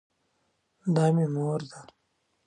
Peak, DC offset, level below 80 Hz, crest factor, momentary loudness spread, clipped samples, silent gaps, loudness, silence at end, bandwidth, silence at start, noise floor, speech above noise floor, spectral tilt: -12 dBFS; under 0.1%; -74 dBFS; 16 dB; 12 LU; under 0.1%; none; -27 LUFS; 0.65 s; 10.5 kHz; 0.85 s; -74 dBFS; 48 dB; -8 dB/octave